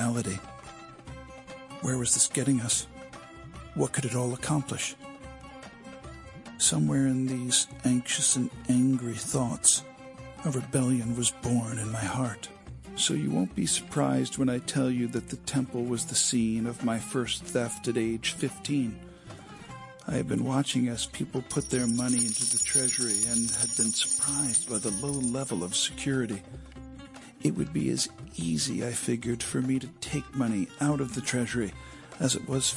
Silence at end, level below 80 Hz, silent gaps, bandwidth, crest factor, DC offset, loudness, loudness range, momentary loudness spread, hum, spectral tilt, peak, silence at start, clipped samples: 0 s; -56 dBFS; none; 11.5 kHz; 22 dB; under 0.1%; -28 LUFS; 6 LU; 21 LU; none; -3.5 dB/octave; -8 dBFS; 0 s; under 0.1%